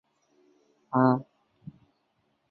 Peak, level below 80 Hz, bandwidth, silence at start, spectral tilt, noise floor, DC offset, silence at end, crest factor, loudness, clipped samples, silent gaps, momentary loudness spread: -8 dBFS; -74 dBFS; 4.5 kHz; 0.95 s; -11 dB/octave; -74 dBFS; under 0.1%; 1.3 s; 24 dB; -26 LUFS; under 0.1%; none; 26 LU